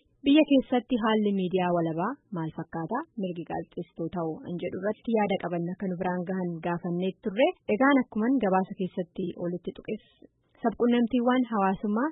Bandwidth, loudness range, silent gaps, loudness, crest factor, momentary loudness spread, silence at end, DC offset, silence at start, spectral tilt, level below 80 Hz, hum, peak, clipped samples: 4 kHz; 5 LU; none; -28 LUFS; 18 dB; 12 LU; 0 s; under 0.1%; 0.25 s; -11 dB/octave; -62 dBFS; none; -8 dBFS; under 0.1%